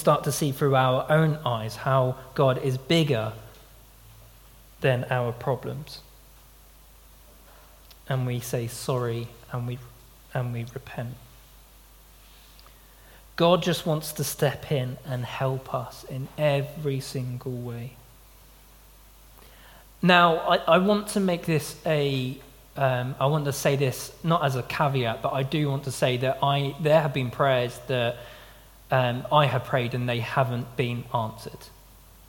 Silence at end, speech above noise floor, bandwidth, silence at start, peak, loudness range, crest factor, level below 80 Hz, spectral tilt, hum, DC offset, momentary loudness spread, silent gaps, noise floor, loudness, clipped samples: 0.6 s; 27 dB; 17.5 kHz; 0 s; -2 dBFS; 11 LU; 24 dB; -54 dBFS; -5.5 dB/octave; none; under 0.1%; 14 LU; none; -52 dBFS; -26 LUFS; under 0.1%